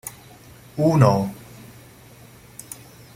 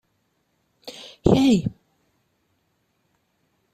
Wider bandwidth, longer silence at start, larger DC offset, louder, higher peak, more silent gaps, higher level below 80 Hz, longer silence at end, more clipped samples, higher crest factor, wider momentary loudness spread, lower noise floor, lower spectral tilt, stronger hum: first, 16 kHz vs 13.5 kHz; second, 0.05 s vs 0.85 s; neither; about the same, -19 LUFS vs -20 LUFS; about the same, -2 dBFS vs -2 dBFS; neither; second, -54 dBFS vs -48 dBFS; second, 0.4 s vs 2.05 s; neither; about the same, 22 dB vs 24 dB; first, 26 LU vs 23 LU; second, -47 dBFS vs -70 dBFS; about the same, -7 dB/octave vs -6.5 dB/octave; neither